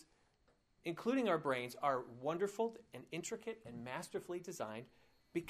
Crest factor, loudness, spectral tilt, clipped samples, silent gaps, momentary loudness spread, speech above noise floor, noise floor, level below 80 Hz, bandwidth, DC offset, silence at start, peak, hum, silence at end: 20 dB; -41 LUFS; -5 dB/octave; under 0.1%; none; 12 LU; 34 dB; -75 dBFS; -78 dBFS; 15.5 kHz; under 0.1%; 0.85 s; -22 dBFS; none; 0 s